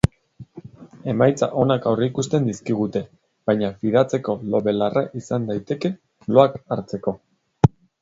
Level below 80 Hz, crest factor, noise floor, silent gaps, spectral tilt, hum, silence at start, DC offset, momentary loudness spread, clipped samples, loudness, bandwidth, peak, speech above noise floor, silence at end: -46 dBFS; 22 dB; -45 dBFS; none; -7 dB/octave; none; 0.05 s; under 0.1%; 11 LU; under 0.1%; -22 LUFS; 11 kHz; 0 dBFS; 25 dB; 0.35 s